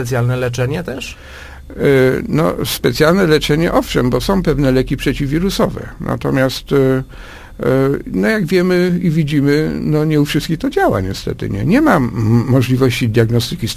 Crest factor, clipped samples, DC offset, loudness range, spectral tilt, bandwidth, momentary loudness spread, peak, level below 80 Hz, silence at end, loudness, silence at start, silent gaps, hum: 14 dB; under 0.1%; under 0.1%; 2 LU; -6.5 dB/octave; 15.5 kHz; 10 LU; 0 dBFS; -32 dBFS; 0 s; -15 LUFS; 0 s; none; none